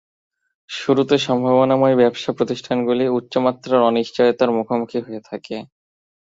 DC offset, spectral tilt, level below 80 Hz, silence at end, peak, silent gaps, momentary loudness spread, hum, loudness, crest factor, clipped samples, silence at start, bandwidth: under 0.1%; -6 dB/octave; -62 dBFS; 0.65 s; -2 dBFS; none; 15 LU; none; -18 LUFS; 18 dB; under 0.1%; 0.7 s; 7.8 kHz